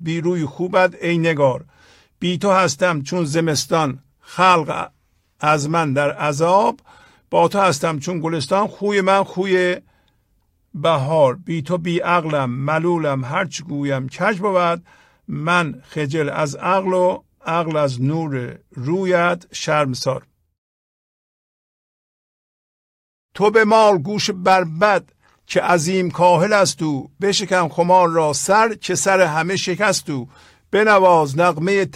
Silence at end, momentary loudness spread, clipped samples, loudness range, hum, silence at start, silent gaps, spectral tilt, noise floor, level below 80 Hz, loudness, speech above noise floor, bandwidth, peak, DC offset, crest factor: 0.05 s; 10 LU; under 0.1%; 5 LU; none; 0 s; 20.58-23.29 s; -5 dB/octave; -63 dBFS; -60 dBFS; -18 LUFS; 45 dB; 15.5 kHz; -2 dBFS; under 0.1%; 16 dB